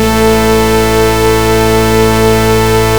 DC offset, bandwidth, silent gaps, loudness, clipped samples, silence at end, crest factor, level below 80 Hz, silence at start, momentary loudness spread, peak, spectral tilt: 5%; over 20 kHz; none; -9 LUFS; 0.3%; 0 s; 8 dB; -20 dBFS; 0 s; 1 LU; 0 dBFS; -5 dB/octave